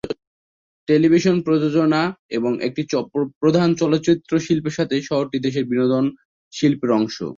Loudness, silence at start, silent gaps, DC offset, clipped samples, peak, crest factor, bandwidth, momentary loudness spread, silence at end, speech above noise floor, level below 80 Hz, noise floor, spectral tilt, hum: -19 LUFS; 0.05 s; 0.27-0.87 s, 2.19-2.29 s, 3.36-3.41 s, 6.25-6.51 s; under 0.1%; under 0.1%; -4 dBFS; 16 dB; 7.4 kHz; 7 LU; 0.05 s; over 71 dB; -58 dBFS; under -90 dBFS; -6.5 dB/octave; none